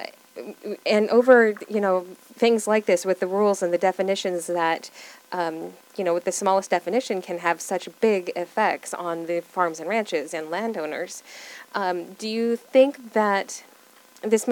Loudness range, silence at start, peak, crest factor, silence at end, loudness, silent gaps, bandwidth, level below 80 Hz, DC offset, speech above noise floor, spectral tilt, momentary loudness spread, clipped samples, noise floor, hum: 6 LU; 0 s; -2 dBFS; 22 dB; 0 s; -23 LUFS; none; 19 kHz; -86 dBFS; under 0.1%; 29 dB; -4 dB/octave; 15 LU; under 0.1%; -52 dBFS; none